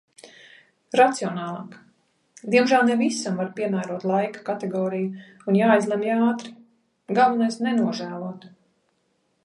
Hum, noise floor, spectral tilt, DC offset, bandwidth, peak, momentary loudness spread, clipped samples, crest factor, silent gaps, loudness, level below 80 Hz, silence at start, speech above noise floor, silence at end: none; -70 dBFS; -5.5 dB/octave; under 0.1%; 11.5 kHz; -4 dBFS; 16 LU; under 0.1%; 20 dB; none; -23 LUFS; -76 dBFS; 0.25 s; 47 dB; 0.95 s